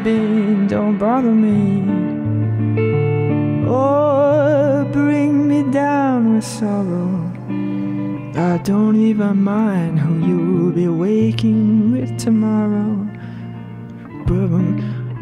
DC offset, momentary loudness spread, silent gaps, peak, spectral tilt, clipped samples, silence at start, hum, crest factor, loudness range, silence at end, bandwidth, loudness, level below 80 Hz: under 0.1%; 9 LU; none; -4 dBFS; -8.5 dB/octave; under 0.1%; 0 s; none; 12 dB; 3 LU; 0 s; 11 kHz; -17 LUFS; -44 dBFS